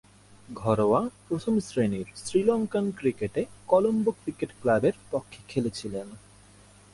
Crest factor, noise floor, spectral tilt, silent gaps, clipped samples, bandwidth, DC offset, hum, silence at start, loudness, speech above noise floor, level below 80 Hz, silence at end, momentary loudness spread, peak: 20 dB; -54 dBFS; -6.5 dB/octave; none; under 0.1%; 11.5 kHz; under 0.1%; 50 Hz at -50 dBFS; 0.5 s; -27 LUFS; 27 dB; -58 dBFS; 0.75 s; 11 LU; -8 dBFS